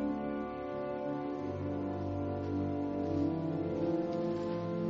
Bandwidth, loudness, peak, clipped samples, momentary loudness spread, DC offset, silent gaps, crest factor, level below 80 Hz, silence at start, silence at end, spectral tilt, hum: 7 kHz; -36 LUFS; -22 dBFS; under 0.1%; 5 LU; under 0.1%; none; 14 dB; -62 dBFS; 0 s; 0 s; -8 dB/octave; none